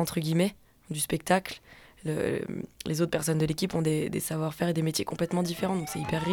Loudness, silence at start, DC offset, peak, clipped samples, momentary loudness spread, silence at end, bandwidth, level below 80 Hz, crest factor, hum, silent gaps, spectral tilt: -29 LUFS; 0 s; under 0.1%; -10 dBFS; under 0.1%; 8 LU; 0 s; 18.5 kHz; -56 dBFS; 20 dB; none; none; -5 dB/octave